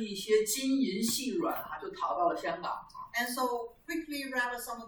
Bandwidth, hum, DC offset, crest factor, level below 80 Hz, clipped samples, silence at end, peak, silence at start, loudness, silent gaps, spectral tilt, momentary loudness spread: over 20 kHz; none; under 0.1%; 16 dB; -66 dBFS; under 0.1%; 0 s; -16 dBFS; 0 s; -33 LUFS; none; -2.5 dB/octave; 9 LU